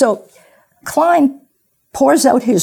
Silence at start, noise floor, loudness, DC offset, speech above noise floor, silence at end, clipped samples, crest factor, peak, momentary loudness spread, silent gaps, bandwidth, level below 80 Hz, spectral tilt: 0 s; -61 dBFS; -14 LUFS; under 0.1%; 48 dB; 0 s; under 0.1%; 14 dB; 0 dBFS; 16 LU; none; 18.5 kHz; -56 dBFS; -4.5 dB/octave